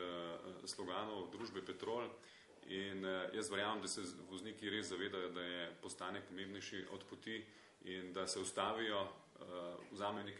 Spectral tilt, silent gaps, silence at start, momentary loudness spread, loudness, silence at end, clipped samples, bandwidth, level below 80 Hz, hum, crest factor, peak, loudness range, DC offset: -3 dB/octave; none; 0 s; 10 LU; -45 LUFS; 0 s; under 0.1%; 11.5 kHz; -78 dBFS; none; 22 dB; -24 dBFS; 3 LU; under 0.1%